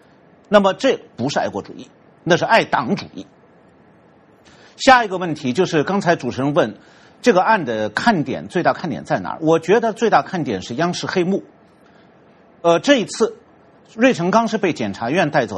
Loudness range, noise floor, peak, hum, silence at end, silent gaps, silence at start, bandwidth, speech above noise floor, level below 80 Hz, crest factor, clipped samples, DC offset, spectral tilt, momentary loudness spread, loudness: 3 LU; -50 dBFS; 0 dBFS; none; 0 s; none; 0.5 s; 11 kHz; 33 dB; -56 dBFS; 18 dB; under 0.1%; under 0.1%; -5 dB/octave; 10 LU; -18 LUFS